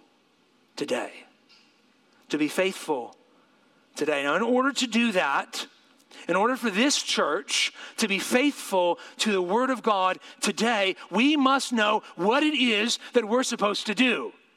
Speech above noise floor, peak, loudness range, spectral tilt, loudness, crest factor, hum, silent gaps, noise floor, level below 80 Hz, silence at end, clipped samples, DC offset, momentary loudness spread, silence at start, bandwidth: 39 dB; -8 dBFS; 8 LU; -3 dB/octave; -25 LUFS; 18 dB; none; none; -64 dBFS; -84 dBFS; 0.25 s; under 0.1%; under 0.1%; 9 LU; 0.75 s; 16 kHz